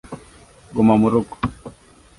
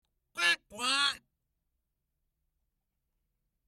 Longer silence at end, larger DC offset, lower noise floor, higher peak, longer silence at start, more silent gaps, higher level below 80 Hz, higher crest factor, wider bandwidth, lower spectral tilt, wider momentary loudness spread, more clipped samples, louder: second, 0.5 s vs 2.5 s; neither; second, -47 dBFS vs -83 dBFS; first, -2 dBFS vs -14 dBFS; second, 0.1 s vs 0.35 s; neither; first, -46 dBFS vs -76 dBFS; second, 18 dB vs 24 dB; second, 11.5 kHz vs 16 kHz; first, -8 dB/octave vs 1 dB/octave; first, 24 LU vs 15 LU; neither; first, -19 LUFS vs -29 LUFS